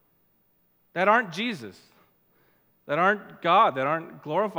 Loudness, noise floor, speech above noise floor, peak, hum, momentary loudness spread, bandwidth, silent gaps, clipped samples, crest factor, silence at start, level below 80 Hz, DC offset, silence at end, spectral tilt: -24 LUFS; -67 dBFS; 42 dB; -6 dBFS; none; 13 LU; 16.5 kHz; none; under 0.1%; 22 dB; 0.95 s; -82 dBFS; under 0.1%; 0 s; -5.5 dB/octave